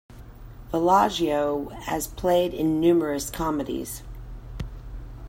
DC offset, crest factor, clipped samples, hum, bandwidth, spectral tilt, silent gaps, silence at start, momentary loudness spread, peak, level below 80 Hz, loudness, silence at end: under 0.1%; 18 dB; under 0.1%; none; 16.5 kHz; -5 dB/octave; none; 0.1 s; 20 LU; -8 dBFS; -42 dBFS; -24 LUFS; 0 s